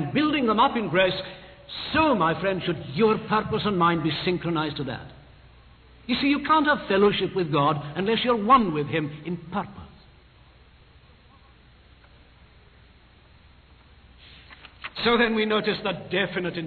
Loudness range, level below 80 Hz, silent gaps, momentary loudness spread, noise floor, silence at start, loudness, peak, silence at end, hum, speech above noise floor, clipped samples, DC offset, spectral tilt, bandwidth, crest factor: 10 LU; -52 dBFS; none; 12 LU; -54 dBFS; 0 s; -24 LUFS; -6 dBFS; 0 s; none; 30 dB; under 0.1%; under 0.1%; -9 dB/octave; 4.6 kHz; 20 dB